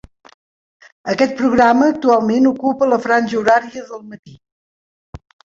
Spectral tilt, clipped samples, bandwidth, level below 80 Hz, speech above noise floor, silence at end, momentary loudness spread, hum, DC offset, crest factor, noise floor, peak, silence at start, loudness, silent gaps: -5.5 dB/octave; under 0.1%; 7.6 kHz; -52 dBFS; over 75 dB; 0.4 s; 18 LU; none; under 0.1%; 16 dB; under -90 dBFS; -2 dBFS; 1.05 s; -15 LUFS; 4.19-4.23 s, 4.52-5.13 s